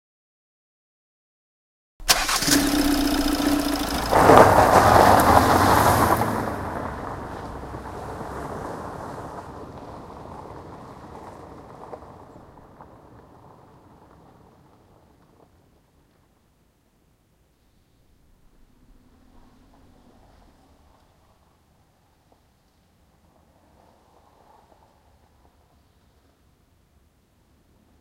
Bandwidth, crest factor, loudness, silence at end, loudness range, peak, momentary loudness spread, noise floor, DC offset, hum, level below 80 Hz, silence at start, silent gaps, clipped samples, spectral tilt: 16 kHz; 26 dB; -19 LUFS; 15.15 s; 26 LU; 0 dBFS; 27 LU; -63 dBFS; under 0.1%; none; -42 dBFS; 2 s; none; under 0.1%; -4 dB/octave